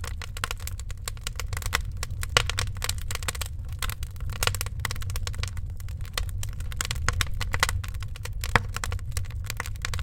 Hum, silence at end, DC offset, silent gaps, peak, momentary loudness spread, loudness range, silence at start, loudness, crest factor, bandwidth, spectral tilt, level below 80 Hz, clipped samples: none; 0 s; under 0.1%; none; 0 dBFS; 10 LU; 3 LU; 0 s; -30 LUFS; 28 dB; 17 kHz; -2.5 dB/octave; -34 dBFS; under 0.1%